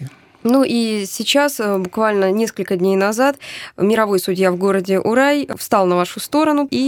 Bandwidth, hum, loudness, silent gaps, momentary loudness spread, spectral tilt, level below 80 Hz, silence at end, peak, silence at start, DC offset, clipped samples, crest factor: 19.5 kHz; none; -17 LUFS; none; 5 LU; -4.5 dB/octave; -62 dBFS; 0 s; -2 dBFS; 0 s; under 0.1%; under 0.1%; 16 dB